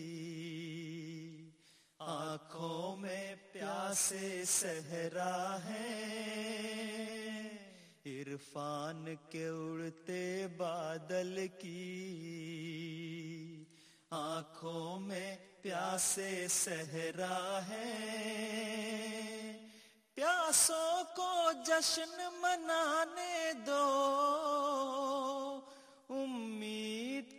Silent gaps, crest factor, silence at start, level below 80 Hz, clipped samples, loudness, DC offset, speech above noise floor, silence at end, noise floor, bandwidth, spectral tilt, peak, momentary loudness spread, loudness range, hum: none; 22 dB; 0 s; -82 dBFS; under 0.1%; -38 LUFS; under 0.1%; 29 dB; 0 s; -67 dBFS; 15.5 kHz; -2.5 dB/octave; -16 dBFS; 14 LU; 11 LU; none